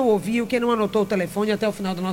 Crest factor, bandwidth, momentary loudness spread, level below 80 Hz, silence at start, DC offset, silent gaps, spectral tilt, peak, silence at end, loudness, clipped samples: 14 dB; 17 kHz; 3 LU; -54 dBFS; 0 s; under 0.1%; none; -6 dB/octave; -8 dBFS; 0 s; -22 LUFS; under 0.1%